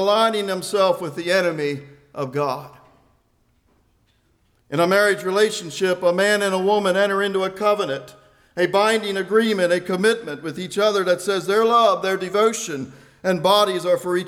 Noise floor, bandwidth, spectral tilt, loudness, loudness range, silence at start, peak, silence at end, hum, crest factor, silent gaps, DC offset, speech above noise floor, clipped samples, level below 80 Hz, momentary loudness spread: -63 dBFS; 16.5 kHz; -4 dB/octave; -20 LUFS; 6 LU; 0 s; -6 dBFS; 0 s; none; 14 dB; none; under 0.1%; 43 dB; under 0.1%; -66 dBFS; 11 LU